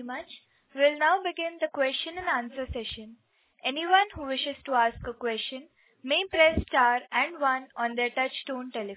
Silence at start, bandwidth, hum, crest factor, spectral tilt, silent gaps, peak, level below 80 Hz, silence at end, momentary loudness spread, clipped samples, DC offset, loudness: 0 s; 4 kHz; none; 20 dB; -7.5 dB/octave; none; -8 dBFS; -50 dBFS; 0 s; 13 LU; under 0.1%; under 0.1%; -27 LUFS